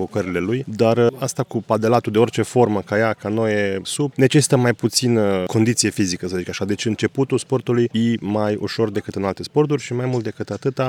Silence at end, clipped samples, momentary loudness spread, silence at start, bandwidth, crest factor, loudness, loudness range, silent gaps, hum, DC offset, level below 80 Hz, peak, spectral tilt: 0 s; under 0.1%; 8 LU; 0 s; 17 kHz; 16 dB; -20 LUFS; 3 LU; none; none; under 0.1%; -60 dBFS; -2 dBFS; -5 dB/octave